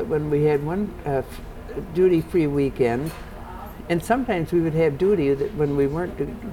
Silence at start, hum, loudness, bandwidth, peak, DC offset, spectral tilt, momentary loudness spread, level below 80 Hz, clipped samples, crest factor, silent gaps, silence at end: 0 s; none; -22 LUFS; 18 kHz; -8 dBFS; under 0.1%; -8 dB/octave; 17 LU; -40 dBFS; under 0.1%; 14 dB; none; 0 s